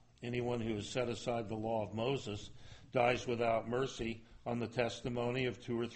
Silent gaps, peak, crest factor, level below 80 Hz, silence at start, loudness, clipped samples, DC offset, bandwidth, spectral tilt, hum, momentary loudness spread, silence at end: none; -18 dBFS; 20 dB; -60 dBFS; 0.2 s; -38 LUFS; under 0.1%; under 0.1%; 8.4 kHz; -5.5 dB/octave; none; 9 LU; 0 s